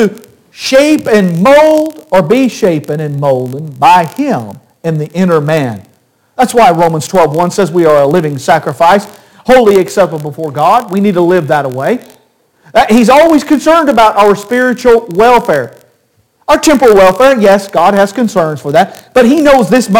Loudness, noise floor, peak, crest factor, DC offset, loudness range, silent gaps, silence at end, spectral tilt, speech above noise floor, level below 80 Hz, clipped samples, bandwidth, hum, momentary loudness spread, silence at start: -8 LUFS; -54 dBFS; 0 dBFS; 8 dB; 0.3%; 4 LU; none; 0 s; -5.5 dB/octave; 46 dB; -40 dBFS; under 0.1%; 17.5 kHz; none; 9 LU; 0 s